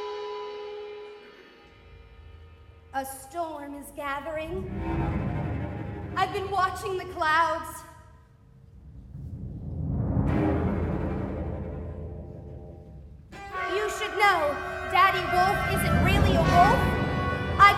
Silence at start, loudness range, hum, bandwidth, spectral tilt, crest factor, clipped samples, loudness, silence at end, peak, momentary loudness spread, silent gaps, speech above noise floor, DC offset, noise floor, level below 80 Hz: 0 s; 14 LU; none; 15.5 kHz; -5.5 dB/octave; 22 dB; under 0.1%; -26 LUFS; 0 s; -4 dBFS; 21 LU; none; 24 dB; under 0.1%; -54 dBFS; -40 dBFS